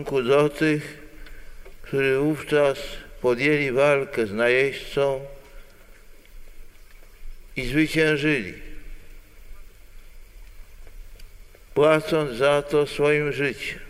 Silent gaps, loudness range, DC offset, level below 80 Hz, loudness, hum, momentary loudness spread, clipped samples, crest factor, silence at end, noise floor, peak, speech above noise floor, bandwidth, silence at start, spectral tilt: none; 7 LU; under 0.1%; -42 dBFS; -22 LUFS; none; 13 LU; under 0.1%; 20 dB; 0 s; -46 dBFS; -4 dBFS; 24 dB; 16 kHz; 0 s; -5.5 dB/octave